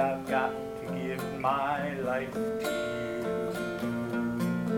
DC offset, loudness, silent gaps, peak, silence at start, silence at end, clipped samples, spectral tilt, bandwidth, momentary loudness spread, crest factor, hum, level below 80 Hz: under 0.1%; -32 LUFS; none; -14 dBFS; 0 s; 0 s; under 0.1%; -6 dB/octave; 19 kHz; 5 LU; 18 dB; none; -58 dBFS